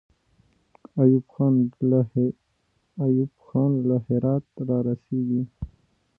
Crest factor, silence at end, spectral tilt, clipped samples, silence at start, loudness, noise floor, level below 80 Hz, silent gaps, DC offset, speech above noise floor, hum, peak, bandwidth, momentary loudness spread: 18 dB; 0.5 s; -14 dB/octave; under 0.1%; 0.95 s; -24 LUFS; -70 dBFS; -52 dBFS; none; under 0.1%; 47 dB; none; -6 dBFS; 1.7 kHz; 13 LU